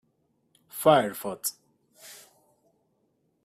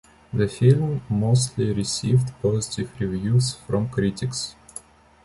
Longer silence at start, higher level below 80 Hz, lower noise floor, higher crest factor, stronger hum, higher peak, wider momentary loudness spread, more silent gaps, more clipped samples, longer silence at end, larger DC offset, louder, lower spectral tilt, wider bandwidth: first, 0.75 s vs 0.35 s; second, -68 dBFS vs -48 dBFS; first, -72 dBFS vs -44 dBFS; first, 24 dB vs 18 dB; neither; about the same, -6 dBFS vs -6 dBFS; first, 25 LU vs 11 LU; neither; neither; first, 1.3 s vs 0.75 s; neither; about the same, -25 LUFS vs -23 LUFS; second, -4 dB/octave vs -6 dB/octave; first, 15.5 kHz vs 11.5 kHz